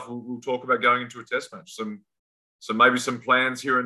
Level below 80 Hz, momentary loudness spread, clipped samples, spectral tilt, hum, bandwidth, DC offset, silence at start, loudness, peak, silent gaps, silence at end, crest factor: -76 dBFS; 16 LU; under 0.1%; -3.5 dB/octave; none; 12.5 kHz; under 0.1%; 0 s; -23 LUFS; -6 dBFS; 2.19-2.59 s; 0 s; 20 dB